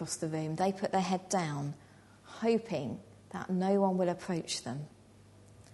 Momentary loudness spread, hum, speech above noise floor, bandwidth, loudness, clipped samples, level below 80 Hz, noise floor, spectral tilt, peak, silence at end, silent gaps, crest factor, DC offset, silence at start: 15 LU; none; 25 dB; 11.5 kHz; -33 LUFS; under 0.1%; -70 dBFS; -58 dBFS; -5.5 dB/octave; -16 dBFS; 0 s; none; 18 dB; under 0.1%; 0 s